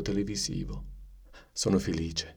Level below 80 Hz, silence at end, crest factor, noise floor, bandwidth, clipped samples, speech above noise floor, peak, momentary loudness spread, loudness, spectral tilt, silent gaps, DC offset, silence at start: -44 dBFS; 0 s; 18 dB; -52 dBFS; 19 kHz; under 0.1%; 21 dB; -14 dBFS; 14 LU; -31 LUFS; -4.5 dB/octave; none; under 0.1%; 0 s